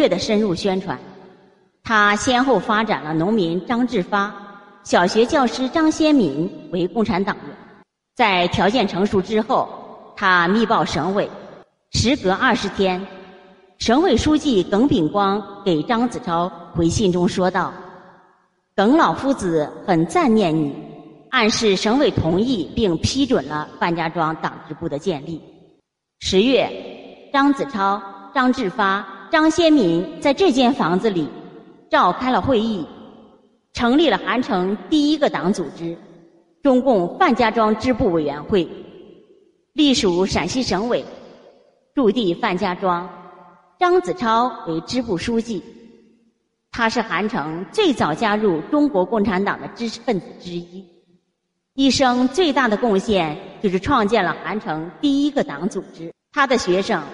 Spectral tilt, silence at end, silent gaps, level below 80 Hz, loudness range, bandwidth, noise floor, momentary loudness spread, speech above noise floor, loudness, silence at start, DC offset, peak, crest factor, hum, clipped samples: -5 dB/octave; 0 s; none; -46 dBFS; 4 LU; 11.5 kHz; -74 dBFS; 12 LU; 55 dB; -19 LUFS; 0 s; under 0.1%; -2 dBFS; 18 dB; none; under 0.1%